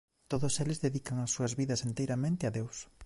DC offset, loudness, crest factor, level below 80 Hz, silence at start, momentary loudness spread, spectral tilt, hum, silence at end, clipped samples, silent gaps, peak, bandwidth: under 0.1%; -34 LUFS; 16 dB; -60 dBFS; 0.1 s; 5 LU; -5 dB/octave; none; 0 s; under 0.1%; none; -18 dBFS; 11.5 kHz